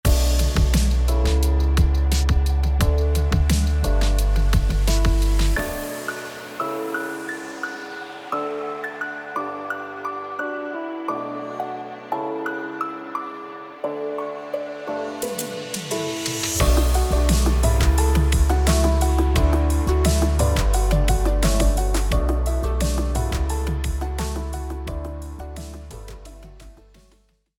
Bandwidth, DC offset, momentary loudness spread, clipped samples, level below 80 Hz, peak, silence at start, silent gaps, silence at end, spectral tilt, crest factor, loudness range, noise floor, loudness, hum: 18 kHz; under 0.1%; 11 LU; under 0.1%; -22 dBFS; -6 dBFS; 0.05 s; none; 0.85 s; -5 dB/octave; 14 dB; 10 LU; -60 dBFS; -23 LUFS; none